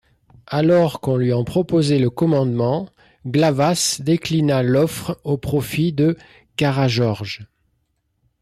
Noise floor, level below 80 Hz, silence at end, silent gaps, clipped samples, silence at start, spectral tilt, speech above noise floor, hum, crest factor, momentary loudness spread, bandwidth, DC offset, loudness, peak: -69 dBFS; -50 dBFS; 0.95 s; none; under 0.1%; 0.5 s; -6 dB/octave; 51 dB; none; 12 dB; 10 LU; 15 kHz; under 0.1%; -19 LUFS; -8 dBFS